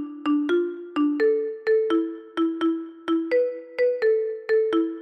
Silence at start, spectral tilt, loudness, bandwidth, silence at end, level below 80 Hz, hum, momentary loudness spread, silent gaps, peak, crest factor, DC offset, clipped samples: 0 s; -5.5 dB/octave; -24 LUFS; 6 kHz; 0 s; -76 dBFS; none; 5 LU; none; -12 dBFS; 10 dB; under 0.1%; under 0.1%